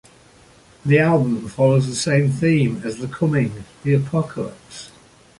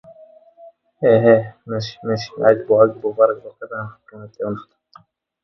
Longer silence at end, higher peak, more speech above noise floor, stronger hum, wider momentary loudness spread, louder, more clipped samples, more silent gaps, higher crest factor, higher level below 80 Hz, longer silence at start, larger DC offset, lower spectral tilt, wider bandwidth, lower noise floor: second, 0.55 s vs 0.8 s; second, -4 dBFS vs 0 dBFS; about the same, 31 dB vs 33 dB; neither; second, 13 LU vs 16 LU; about the same, -19 LUFS vs -18 LUFS; neither; neither; about the same, 16 dB vs 18 dB; first, -52 dBFS vs -60 dBFS; second, 0.85 s vs 1 s; neither; about the same, -6.5 dB/octave vs -7.5 dB/octave; first, 11.5 kHz vs 6.2 kHz; about the same, -50 dBFS vs -51 dBFS